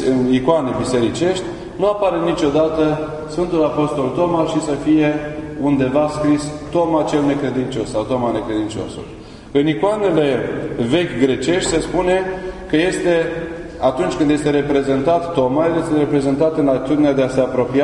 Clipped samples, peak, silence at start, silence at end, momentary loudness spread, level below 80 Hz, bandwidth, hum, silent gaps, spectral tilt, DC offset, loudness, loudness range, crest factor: under 0.1%; 0 dBFS; 0 s; 0 s; 7 LU; -40 dBFS; 11 kHz; none; none; -6 dB/octave; under 0.1%; -18 LUFS; 3 LU; 16 dB